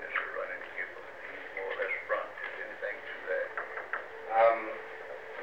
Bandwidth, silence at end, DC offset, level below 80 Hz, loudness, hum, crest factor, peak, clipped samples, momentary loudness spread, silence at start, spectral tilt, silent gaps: 7.8 kHz; 0 s; 0.2%; -76 dBFS; -34 LUFS; none; 22 dB; -14 dBFS; under 0.1%; 16 LU; 0 s; -4 dB/octave; none